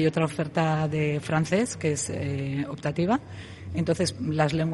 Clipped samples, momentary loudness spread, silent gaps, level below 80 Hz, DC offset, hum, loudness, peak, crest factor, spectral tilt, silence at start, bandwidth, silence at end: under 0.1%; 5 LU; none; -56 dBFS; under 0.1%; none; -27 LUFS; -8 dBFS; 18 dB; -6 dB/octave; 0 s; 11.5 kHz; 0 s